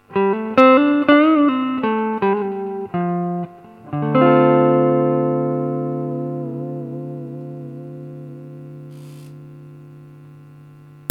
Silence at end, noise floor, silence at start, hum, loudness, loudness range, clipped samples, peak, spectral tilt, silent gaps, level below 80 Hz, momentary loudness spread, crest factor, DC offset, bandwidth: 0.55 s; -43 dBFS; 0.1 s; 50 Hz at -55 dBFS; -17 LUFS; 19 LU; under 0.1%; 0 dBFS; -9 dB/octave; none; -66 dBFS; 23 LU; 18 dB; under 0.1%; 5.8 kHz